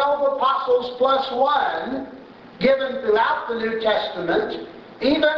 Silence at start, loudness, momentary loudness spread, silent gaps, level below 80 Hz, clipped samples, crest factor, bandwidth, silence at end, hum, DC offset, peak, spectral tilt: 0 s; -21 LUFS; 10 LU; none; -56 dBFS; under 0.1%; 16 dB; 6.4 kHz; 0 s; none; under 0.1%; -4 dBFS; -6 dB/octave